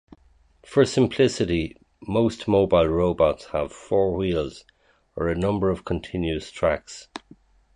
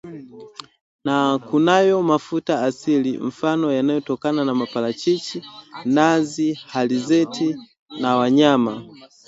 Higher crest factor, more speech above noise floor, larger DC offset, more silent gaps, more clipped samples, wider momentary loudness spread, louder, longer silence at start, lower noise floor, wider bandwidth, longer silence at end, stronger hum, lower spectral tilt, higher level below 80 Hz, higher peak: about the same, 18 dB vs 18 dB; first, 35 dB vs 21 dB; neither; second, none vs 0.81-0.99 s, 7.79-7.86 s; neither; second, 15 LU vs 18 LU; second, -23 LUFS vs -20 LUFS; first, 0.7 s vs 0.05 s; first, -57 dBFS vs -40 dBFS; first, 11 kHz vs 8 kHz; first, 0.6 s vs 0.2 s; neither; about the same, -6.5 dB/octave vs -5.5 dB/octave; first, -42 dBFS vs -66 dBFS; second, -6 dBFS vs -2 dBFS